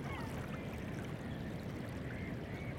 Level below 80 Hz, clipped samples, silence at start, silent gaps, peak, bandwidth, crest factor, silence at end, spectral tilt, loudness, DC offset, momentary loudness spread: -54 dBFS; under 0.1%; 0 s; none; -30 dBFS; 16 kHz; 12 dB; 0 s; -6.5 dB/octave; -44 LUFS; under 0.1%; 1 LU